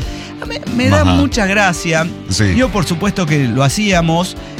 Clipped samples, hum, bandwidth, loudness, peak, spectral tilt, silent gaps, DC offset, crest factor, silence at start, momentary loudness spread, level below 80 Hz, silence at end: under 0.1%; none; 16.5 kHz; -14 LUFS; -2 dBFS; -5 dB/octave; none; under 0.1%; 12 dB; 0 s; 8 LU; -30 dBFS; 0 s